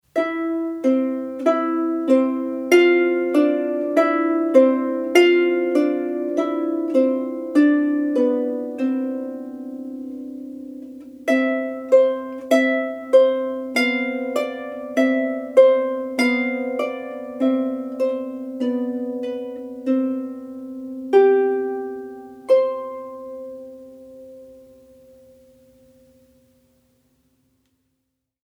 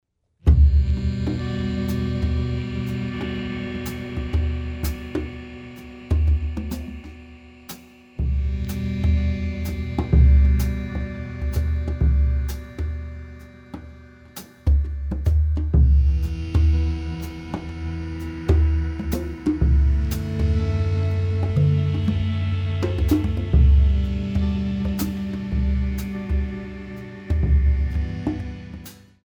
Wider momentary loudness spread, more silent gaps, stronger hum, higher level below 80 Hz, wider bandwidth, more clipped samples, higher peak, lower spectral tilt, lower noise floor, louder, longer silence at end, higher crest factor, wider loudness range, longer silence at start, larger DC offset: about the same, 17 LU vs 18 LU; neither; neither; second, -70 dBFS vs -24 dBFS; second, 13.5 kHz vs 18.5 kHz; neither; first, 0 dBFS vs -4 dBFS; second, -4 dB/octave vs -8 dB/octave; first, -76 dBFS vs -43 dBFS; first, -20 LUFS vs -23 LUFS; first, 3.85 s vs 0.3 s; about the same, 20 dB vs 18 dB; about the same, 8 LU vs 6 LU; second, 0.15 s vs 0.45 s; neither